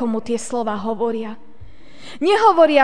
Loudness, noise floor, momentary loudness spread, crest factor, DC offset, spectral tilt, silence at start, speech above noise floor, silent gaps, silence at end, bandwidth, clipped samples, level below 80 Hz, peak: -18 LUFS; -45 dBFS; 16 LU; 18 dB; 2%; -4 dB/octave; 0 s; 27 dB; none; 0 s; 10 kHz; under 0.1%; -54 dBFS; 0 dBFS